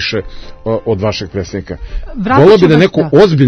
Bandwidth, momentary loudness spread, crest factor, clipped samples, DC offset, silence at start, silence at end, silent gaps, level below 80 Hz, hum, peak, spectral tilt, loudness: 8 kHz; 18 LU; 10 dB; 1%; under 0.1%; 0 s; 0 s; none; -30 dBFS; none; 0 dBFS; -7 dB/octave; -11 LUFS